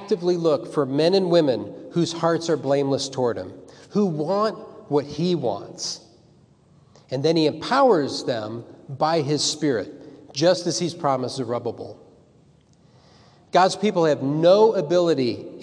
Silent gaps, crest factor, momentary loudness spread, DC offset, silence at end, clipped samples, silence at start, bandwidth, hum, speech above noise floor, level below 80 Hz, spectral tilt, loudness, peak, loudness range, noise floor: none; 18 dB; 12 LU; under 0.1%; 0 s; under 0.1%; 0 s; 10.5 kHz; none; 34 dB; -68 dBFS; -5 dB/octave; -22 LUFS; -4 dBFS; 5 LU; -55 dBFS